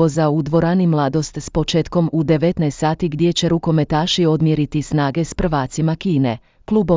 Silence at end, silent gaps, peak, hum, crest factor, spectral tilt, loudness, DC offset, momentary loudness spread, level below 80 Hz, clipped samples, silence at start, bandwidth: 0 s; none; -4 dBFS; none; 14 dB; -6.5 dB/octave; -18 LUFS; under 0.1%; 4 LU; -38 dBFS; under 0.1%; 0 s; 7.6 kHz